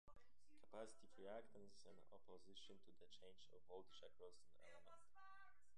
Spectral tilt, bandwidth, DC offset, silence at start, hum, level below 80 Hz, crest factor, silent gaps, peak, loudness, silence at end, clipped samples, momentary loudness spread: -3.5 dB/octave; 10 kHz; 0.1%; 0.05 s; none; -84 dBFS; 22 dB; none; -42 dBFS; -64 LUFS; 0 s; under 0.1%; 10 LU